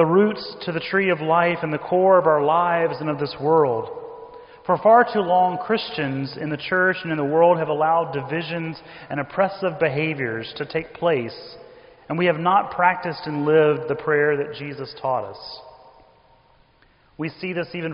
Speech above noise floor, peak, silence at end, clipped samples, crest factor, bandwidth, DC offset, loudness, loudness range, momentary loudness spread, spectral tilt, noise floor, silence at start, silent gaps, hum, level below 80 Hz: 37 dB; -4 dBFS; 0 s; under 0.1%; 18 dB; 5.4 kHz; under 0.1%; -21 LUFS; 6 LU; 15 LU; -4 dB/octave; -57 dBFS; 0 s; none; none; -60 dBFS